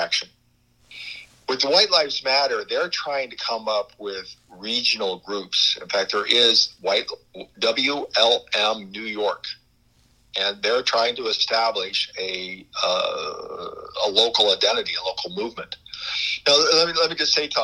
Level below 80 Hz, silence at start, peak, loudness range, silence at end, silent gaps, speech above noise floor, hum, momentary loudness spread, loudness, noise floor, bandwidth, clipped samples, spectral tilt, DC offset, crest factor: -64 dBFS; 0 s; -2 dBFS; 4 LU; 0 s; none; 39 dB; none; 17 LU; -21 LUFS; -61 dBFS; 11.5 kHz; under 0.1%; -1 dB/octave; under 0.1%; 22 dB